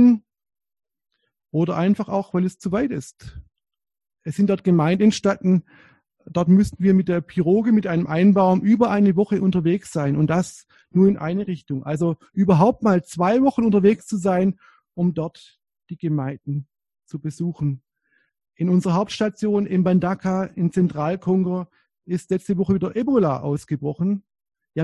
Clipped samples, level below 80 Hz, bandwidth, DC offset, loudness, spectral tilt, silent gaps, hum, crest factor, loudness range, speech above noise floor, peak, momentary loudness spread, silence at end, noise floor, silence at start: under 0.1%; -52 dBFS; 11.5 kHz; under 0.1%; -21 LUFS; -8 dB/octave; none; none; 18 dB; 7 LU; 48 dB; -4 dBFS; 12 LU; 0 s; -67 dBFS; 0 s